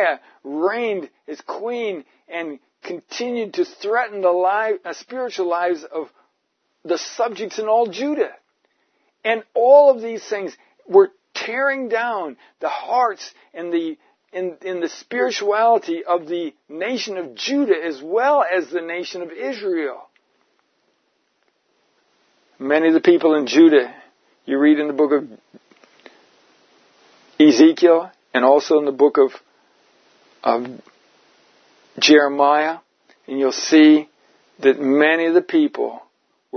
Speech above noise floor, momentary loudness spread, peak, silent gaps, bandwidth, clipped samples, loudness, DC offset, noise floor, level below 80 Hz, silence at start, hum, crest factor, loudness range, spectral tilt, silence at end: 53 dB; 18 LU; 0 dBFS; none; 6.6 kHz; under 0.1%; -18 LUFS; under 0.1%; -71 dBFS; -80 dBFS; 0 s; none; 18 dB; 8 LU; -3.5 dB/octave; 0 s